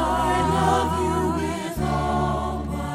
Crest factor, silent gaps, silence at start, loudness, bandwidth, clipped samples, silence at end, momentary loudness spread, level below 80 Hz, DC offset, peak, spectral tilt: 16 dB; none; 0 s; -23 LUFS; 15.5 kHz; under 0.1%; 0 s; 7 LU; -34 dBFS; under 0.1%; -8 dBFS; -6 dB/octave